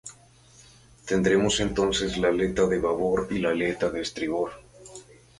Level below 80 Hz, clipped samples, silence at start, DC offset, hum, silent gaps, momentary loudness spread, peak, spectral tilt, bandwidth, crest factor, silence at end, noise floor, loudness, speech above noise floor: -48 dBFS; under 0.1%; 0.05 s; under 0.1%; none; none; 22 LU; -10 dBFS; -4.5 dB/octave; 11.5 kHz; 18 dB; 0.4 s; -54 dBFS; -25 LUFS; 30 dB